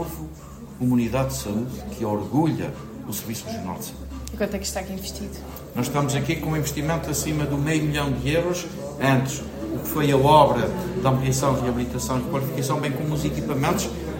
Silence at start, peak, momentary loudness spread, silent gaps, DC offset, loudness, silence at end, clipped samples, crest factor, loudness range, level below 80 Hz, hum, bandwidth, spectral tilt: 0 s; -2 dBFS; 12 LU; none; under 0.1%; -24 LUFS; 0 s; under 0.1%; 22 dB; 7 LU; -40 dBFS; none; 16.5 kHz; -5.5 dB/octave